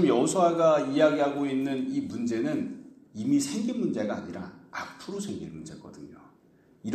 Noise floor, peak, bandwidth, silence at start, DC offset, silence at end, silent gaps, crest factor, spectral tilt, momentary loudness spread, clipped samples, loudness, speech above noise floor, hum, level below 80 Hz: -60 dBFS; -10 dBFS; 13.5 kHz; 0 s; under 0.1%; 0 s; none; 18 dB; -5.5 dB/octave; 21 LU; under 0.1%; -27 LUFS; 33 dB; none; -68 dBFS